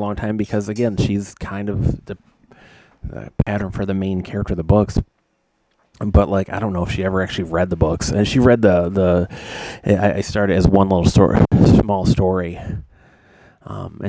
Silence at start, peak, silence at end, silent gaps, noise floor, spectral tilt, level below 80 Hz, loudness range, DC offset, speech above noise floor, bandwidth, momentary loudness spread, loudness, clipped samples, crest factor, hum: 0 s; 0 dBFS; 0 s; none; -66 dBFS; -7 dB/octave; -30 dBFS; 8 LU; under 0.1%; 49 dB; 8 kHz; 17 LU; -18 LUFS; under 0.1%; 18 dB; none